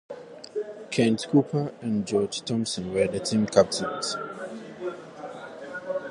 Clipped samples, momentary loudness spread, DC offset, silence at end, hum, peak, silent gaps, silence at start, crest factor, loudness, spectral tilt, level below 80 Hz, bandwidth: under 0.1%; 17 LU; under 0.1%; 0 s; none; -4 dBFS; none; 0.1 s; 24 dB; -27 LUFS; -5 dB/octave; -60 dBFS; 11.5 kHz